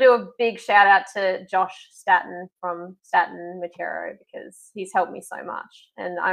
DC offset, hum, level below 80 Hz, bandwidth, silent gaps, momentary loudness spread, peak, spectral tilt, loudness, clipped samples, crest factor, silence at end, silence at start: under 0.1%; none; -78 dBFS; 12.5 kHz; none; 19 LU; -2 dBFS; -3.5 dB/octave; -22 LUFS; under 0.1%; 20 dB; 0 s; 0 s